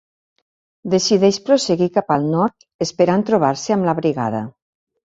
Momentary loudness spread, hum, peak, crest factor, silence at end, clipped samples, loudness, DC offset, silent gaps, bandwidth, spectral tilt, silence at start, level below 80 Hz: 10 LU; none; -2 dBFS; 16 dB; 0.65 s; under 0.1%; -18 LUFS; under 0.1%; 2.74-2.79 s; 7.8 kHz; -5.5 dB/octave; 0.85 s; -58 dBFS